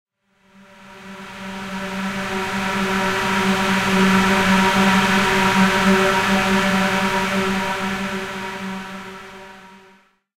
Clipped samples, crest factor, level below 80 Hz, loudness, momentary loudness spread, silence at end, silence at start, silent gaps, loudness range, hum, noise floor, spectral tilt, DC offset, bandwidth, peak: under 0.1%; 16 dB; -44 dBFS; -18 LUFS; 18 LU; 0.6 s; 0.8 s; none; 8 LU; none; -57 dBFS; -4.5 dB/octave; under 0.1%; 16 kHz; -4 dBFS